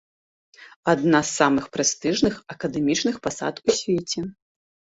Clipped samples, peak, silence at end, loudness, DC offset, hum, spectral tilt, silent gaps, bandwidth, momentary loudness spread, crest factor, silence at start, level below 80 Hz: under 0.1%; -2 dBFS; 0.6 s; -23 LUFS; under 0.1%; none; -3.5 dB/octave; 0.76-0.83 s; 8 kHz; 10 LU; 22 dB; 0.6 s; -56 dBFS